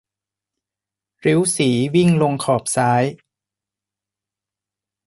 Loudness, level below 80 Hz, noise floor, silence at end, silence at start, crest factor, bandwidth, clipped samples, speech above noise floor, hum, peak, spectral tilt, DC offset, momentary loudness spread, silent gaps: -18 LUFS; -58 dBFS; -88 dBFS; 1.9 s; 1.25 s; 16 dB; 11.5 kHz; under 0.1%; 71 dB; none; -4 dBFS; -5.5 dB/octave; under 0.1%; 4 LU; none